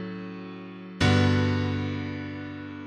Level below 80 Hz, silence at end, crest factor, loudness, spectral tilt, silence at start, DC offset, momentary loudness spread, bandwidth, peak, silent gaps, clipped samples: -50 dBFS; 0 s; 18 dB; -26 LUFS; -6.5 dB/octave; 0 s; under 0.1%; 18 LU; 9.8 kHz; -10 dBFS; none; under 0.1%